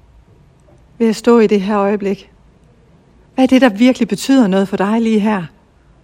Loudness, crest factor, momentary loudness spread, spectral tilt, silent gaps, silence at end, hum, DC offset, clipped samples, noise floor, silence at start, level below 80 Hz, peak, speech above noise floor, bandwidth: -13 LUFS; 14 dB; 11 LU; -6 dB/octave; none; 0.55 s; none; under 0.1%; under 0.1%; -48 dBFS; 1 s; -50 dBFS; 0 dBFS; 35 dB; 16 kHz